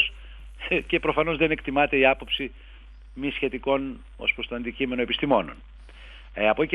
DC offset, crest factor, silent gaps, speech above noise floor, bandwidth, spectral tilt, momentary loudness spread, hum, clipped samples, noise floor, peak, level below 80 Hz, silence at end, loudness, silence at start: under 0.1%; 22 dB; none; 20 dB; 10.5 kHz; -7 dB/octave; 16 LU; none; under 0.1%; -45 dBFS; -4 dBFS; -44 dBFS; 0 s; -25 LUFS; 0 s